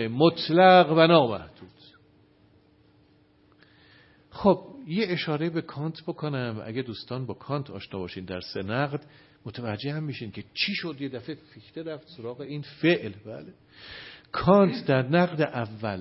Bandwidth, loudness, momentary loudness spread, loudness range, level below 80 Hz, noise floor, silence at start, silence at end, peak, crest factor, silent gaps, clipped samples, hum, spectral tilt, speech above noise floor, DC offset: 5.8 kHz; -25 LUFS; 20 LU; 9 LU; -60 dBFS; -61 dBFS; 0 s; 0 s; -2 dBFS; 24 dB; none; under 0.1%; none; -10 dB/octave; 35 dB; under 0.1%